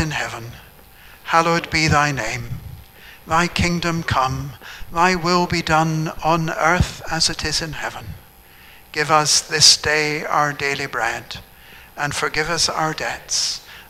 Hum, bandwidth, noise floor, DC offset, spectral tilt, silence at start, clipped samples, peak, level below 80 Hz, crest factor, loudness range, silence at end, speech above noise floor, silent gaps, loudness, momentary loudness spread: none; 16 kHz; -46 dBFS; under 0.1%; -3 dB/octave; 0 s; under 0.1%; 0 dBFS; -38 dBFS; 20 dB; 5 LU; 0.05 s; 26 dB; none; -18 LUFS; 18 LU